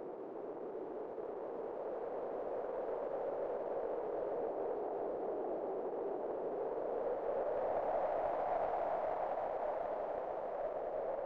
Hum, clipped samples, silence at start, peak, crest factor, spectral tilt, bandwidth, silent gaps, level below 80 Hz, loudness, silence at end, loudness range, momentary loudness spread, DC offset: none; under 0.1%; 0 s; -24 dBFS; 14 dB; -8 dB/octave; 5.8 kHz; none; -72 dBFS; -40 LUFS; 0 s; 4 LU; 7 LU; under 0.1%